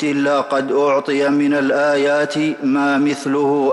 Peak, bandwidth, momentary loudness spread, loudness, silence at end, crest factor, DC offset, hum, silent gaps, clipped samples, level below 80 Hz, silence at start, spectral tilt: -6 dBFS; 11.5 kHz; 3 LU; -17 LUFS; 0 s; 10 dB; under 0.1%; none; none; under 0.1%; -66 dBFS; 0 s; -5.5 dB/octave